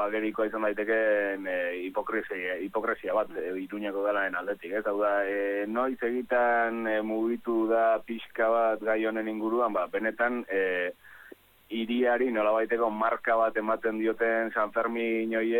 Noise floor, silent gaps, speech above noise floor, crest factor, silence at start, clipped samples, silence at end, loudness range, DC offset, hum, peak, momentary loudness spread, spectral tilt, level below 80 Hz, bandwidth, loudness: -53 dBFS; none; 25 dB; 14 dB; 0 s; under 0.1%; 0 s; 3 LU; under 0.1%; none; -14 dBFS; 7 LU; -6.5 dB/octave; -66 dBFS; 17.5 kHz; -28 LUFS